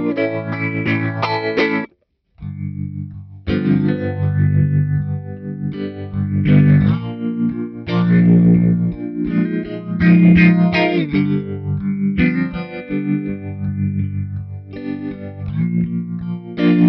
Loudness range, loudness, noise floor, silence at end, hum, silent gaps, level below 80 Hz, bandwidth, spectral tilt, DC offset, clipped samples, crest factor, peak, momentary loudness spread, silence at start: 8 LU; -17 LUFS; -60 dBFS; 0 s; none; none; -42 dBFS; 5.6 kHz; -10 dB/octave; under 0.1%; under 0.1%; 16 dB; 0 dBFS; 15 LU; 0 s